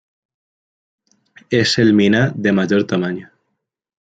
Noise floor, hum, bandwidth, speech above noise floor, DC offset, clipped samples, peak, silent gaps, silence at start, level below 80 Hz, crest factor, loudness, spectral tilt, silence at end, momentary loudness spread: -75 dBFS; none; 9.2 kHz; 60 dB; under 0.1%; under 0.1%; -2 dBFS; none; 1.5 s; -58 dBFS; 16 dB; -16 LUFS; -5.5 dB/octave; 0.8 s; 8 LU